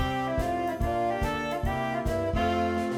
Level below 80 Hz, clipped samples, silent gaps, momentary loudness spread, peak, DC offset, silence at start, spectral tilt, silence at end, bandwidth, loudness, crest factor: -38 dBFS; under 0.1%; none; 3 LU; -16 dBFS; under 0.1%; 0 s; -6.5 dB/octave; 0 s; 17.5 kHz; -29 LUFS; 12 dB